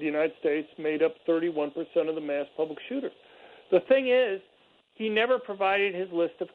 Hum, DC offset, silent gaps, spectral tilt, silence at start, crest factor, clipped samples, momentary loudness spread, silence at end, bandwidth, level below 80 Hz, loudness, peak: none; under 0.1%; none; -7.5 dB/octave; 0 s; 18 dB; under 0.1%; 10 LU; 0.05 s; 4.4 kHz; -76 dBFS; -28 LUFS; -8 dBFS